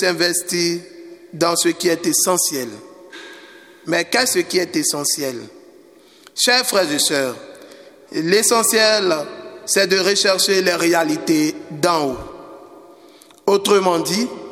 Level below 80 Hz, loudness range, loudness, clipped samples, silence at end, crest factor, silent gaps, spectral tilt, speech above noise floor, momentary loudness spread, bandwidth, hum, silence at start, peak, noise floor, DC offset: -58 dBFS; 4 LU; -17 LUFS; under 0.1%; 0 s; 18 dB; none; -2 dB/octave; 30 dB; 17 LU; 17 kHz; none; 0 s; 0 dBFS; -47 dBFS; under 0.1%